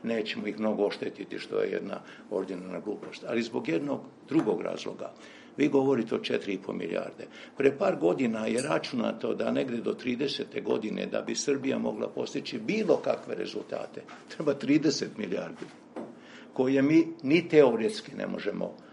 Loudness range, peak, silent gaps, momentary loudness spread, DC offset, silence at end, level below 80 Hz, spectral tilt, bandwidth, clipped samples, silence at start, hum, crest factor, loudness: 6 LU; -8 dBFS; none; 15 LU; under 0.1%; 0 s; -76 dBFS; -5.5 dB/octave; 11.5 kHz; under 0.1%; 0 s; none; 22 dB; -29 LUFS